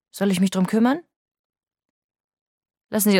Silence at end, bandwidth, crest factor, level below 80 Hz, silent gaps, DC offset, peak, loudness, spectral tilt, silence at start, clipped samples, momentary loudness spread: 0 s; 17.5 kHz; 18 dB; -70 dBFS; 1.16-1.50 s, 1.90-2.09 s, 2.20-2.61 s; under 0.1%; -6 dBFS; -22 LUFS; -5 dB/octave; 0.15 s; under 0.1%; 8 LU